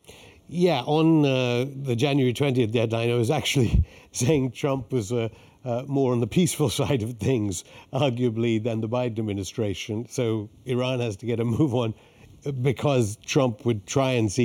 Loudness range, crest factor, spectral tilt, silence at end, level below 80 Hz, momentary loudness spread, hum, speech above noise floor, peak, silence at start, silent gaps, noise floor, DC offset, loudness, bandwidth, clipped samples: 4 LU; 16 dB; -6 dB/octave; 0 s; -42 dBFS; 9 LU; none; 25 dB; -8 dBFS; 0.1 s; none; -49 dBFS; under 0.1%; -25 LUFS; 17 kHz; under 0.1%